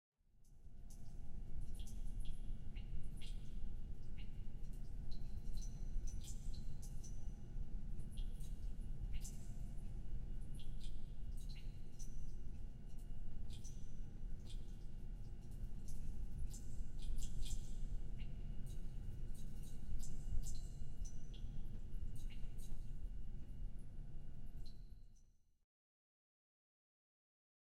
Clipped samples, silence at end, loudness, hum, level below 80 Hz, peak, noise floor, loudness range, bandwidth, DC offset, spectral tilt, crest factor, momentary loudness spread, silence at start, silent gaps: under 0.1%; 2.4 s; -54 LUFS; none; -46 dBFS; -26 dBFS; -67 dBFS; 4 LU; 11 kHz; under 0.1%; -5.5 dB/octave; 16 dB; 6 LU; 0.4 s; none